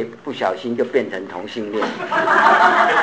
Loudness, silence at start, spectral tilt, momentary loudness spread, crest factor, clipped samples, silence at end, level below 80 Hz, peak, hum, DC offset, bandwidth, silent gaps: -17 LUFS; 0 s; -4 dB/octave; 15 LU; 18 dB; under 0.1%; 0 s; -64 dBFS; 0 dBFS; none; 0.2%; 8 kHz; none